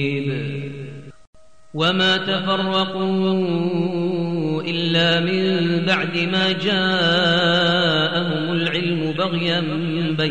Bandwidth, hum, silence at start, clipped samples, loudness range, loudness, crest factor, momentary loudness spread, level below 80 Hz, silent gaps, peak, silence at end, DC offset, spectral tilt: 9 kHz; none; 0 s; under 0.1%; 3 LU; -19 LUFS; 14 dB; 7 LU; -56 dBFS; 1.27-1.33 s; -6 dBFS; 0 s; 0.7%; -6 dB/octave